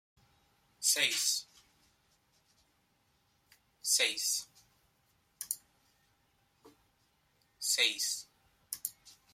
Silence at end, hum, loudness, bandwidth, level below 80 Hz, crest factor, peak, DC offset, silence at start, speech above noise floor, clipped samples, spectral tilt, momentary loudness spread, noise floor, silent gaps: 0.2 s; none; -32 LUFS; 16.5 kHz; -82 dBFS; 26 dB; -12 dBFS; under 0.1%; 0.8 s; 41 dB; under 0.1%; 2.5 dB/octave; 13 LU; -74 dBFS; none